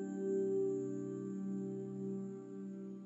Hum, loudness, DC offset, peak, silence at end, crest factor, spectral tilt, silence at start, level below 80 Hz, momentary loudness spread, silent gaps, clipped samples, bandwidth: none; -41 LUFS; under 0.1%; -28 dBFS; 0 s; 12 dB; -9.5 dB/octave; 0 s; under -90 dBFS; 11 LU; none; under 0.1%; 7.8 kHz